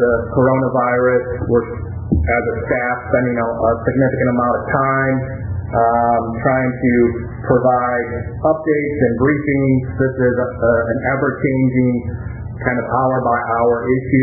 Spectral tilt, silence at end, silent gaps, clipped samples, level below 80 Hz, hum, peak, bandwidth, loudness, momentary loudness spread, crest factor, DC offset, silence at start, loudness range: -17 dB/octave; 0 s; none; under 0.1%; -32 dBFS; none; 0 dBFS; 2.4 kHz; -17 LUFS; 6 LU; 16 dB; under 0.1%; 0 s; 1 LU